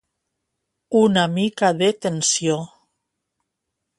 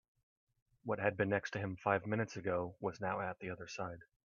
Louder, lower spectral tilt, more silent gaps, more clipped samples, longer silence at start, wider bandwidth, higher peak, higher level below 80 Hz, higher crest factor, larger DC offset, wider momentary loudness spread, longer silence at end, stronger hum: first, -19 LUFS vs -39 LUFS; second, -4 dB/octave vs -6.5 dB/octave; neither; neither; about the same, 0.9 s vs 0.85 s; first, 11.5 kHz vs 7.4 kHz; first, -4 dBFS vs -18 dBFS; first, -64 dBFS vs -72 dBFS; about the same, 18 dB vs 22 dB; neither; second, 7 LU vs 10 LU; first, 1.35 s vs 0.3 s; neither